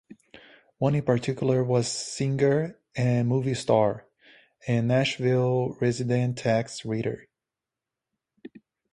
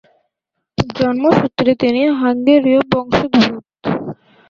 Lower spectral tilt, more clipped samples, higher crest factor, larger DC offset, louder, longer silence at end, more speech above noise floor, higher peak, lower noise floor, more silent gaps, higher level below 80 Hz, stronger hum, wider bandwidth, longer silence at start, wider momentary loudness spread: about the same, -6 dB/octave vs -7 dB/octave; neither; about the same, 18 dB vs 14 dB; neither; second, -26 LUFS vs -15 LUFS; about the same, 0.35 s vs 0.35 s; about the same, 64 dB vs 62 dB; second, -8 dBFS vs 0 dBFS; first, -89 dBFS vs -76 dBFS; neither; second, -60 dBFS vs -46 dBFS; neither; first, 11 kHz vs 7.4 kHz; second, 0.35 s vs 0.8 s; second, 7 LU vs 11 LU